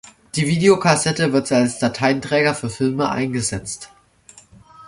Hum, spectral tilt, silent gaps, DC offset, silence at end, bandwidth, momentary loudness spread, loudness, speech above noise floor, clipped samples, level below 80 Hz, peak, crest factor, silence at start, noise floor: none; -4.5 dB/octave; none; under 0.1%; 0 s; 11.5 kHz; 10 LU; -18 LUFS; 30 dB; under 0.1%; -50 dBFS; -2 dBFS; 18 dB; 0.35 s; -49 dBFS